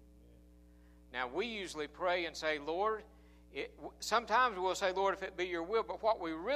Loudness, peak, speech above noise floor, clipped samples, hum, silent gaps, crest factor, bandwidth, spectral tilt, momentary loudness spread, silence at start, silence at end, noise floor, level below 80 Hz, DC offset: -36 LUFS; -16 dBFS; 25 dB; under 0.1%; 60 Hz at -60 dBFS; none; 20 dB; 15 kHz; -3 dB/octave; 12 LU; 1.1 s; 0 s; -60 dBFS; -62 dBFS; under 0.1%